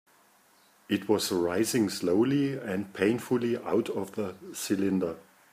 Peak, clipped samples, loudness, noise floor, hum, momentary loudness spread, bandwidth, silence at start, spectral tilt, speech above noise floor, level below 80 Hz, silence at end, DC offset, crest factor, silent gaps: -12 dBFS; under 0.1%; -29 LUFS; -62 dBFS; none; 9 LU; 15.5 kHz; 0.9 s; -5 dB/octave; 34 dB; -72 dBFS; 0.35 s; under 0.1%; 18 dB; none